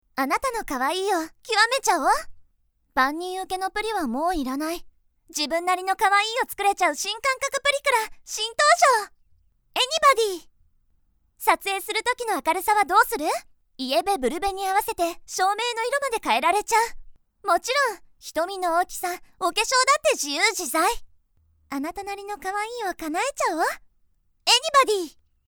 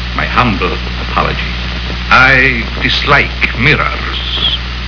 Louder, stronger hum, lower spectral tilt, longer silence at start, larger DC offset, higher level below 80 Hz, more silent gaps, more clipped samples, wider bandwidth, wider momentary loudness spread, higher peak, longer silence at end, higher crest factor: second, -23 LUFS vs -11 LUFS; neither; second, -0.5 dB/octave vs -5 dB/octave; first, 0.15 s vs 0 s; second, under 0.1% vs 0.6%; second, -52 dBFS vs -20 dBFS; neither; second, under 0.1% vs 0.6%; first, over 20 kHz vs 5.4 kHz; about the same, 12 LU vs 11 LU; second, -4 dBFS vs 0 dBFS; first, 0.35 s vs 0 s; first, 20 dB vs 12 dB